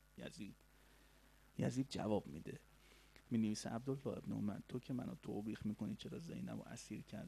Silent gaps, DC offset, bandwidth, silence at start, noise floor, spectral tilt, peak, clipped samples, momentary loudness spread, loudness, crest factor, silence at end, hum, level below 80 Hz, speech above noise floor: none; under 0.1%; 14 kHz; 0.15 s; -69 dBFS; -6.5 dB/octave; -26 dBFS; under 0.1%; 14 LU; -46 LUFS; 20 dB; 0 s; none; -70 dBFS; 24 dB